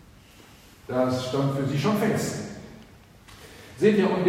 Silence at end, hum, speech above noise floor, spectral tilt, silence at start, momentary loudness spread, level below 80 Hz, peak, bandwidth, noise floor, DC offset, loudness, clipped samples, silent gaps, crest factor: 0 s; none; 28 dB; -6 dB/octave; 0.9 s; 24 LU; -56 dBFS; -8 dBFS; 16 kHz; -51 dBFS; under 0.1%; -25 LUFS; under 0.1%; none; 20 dB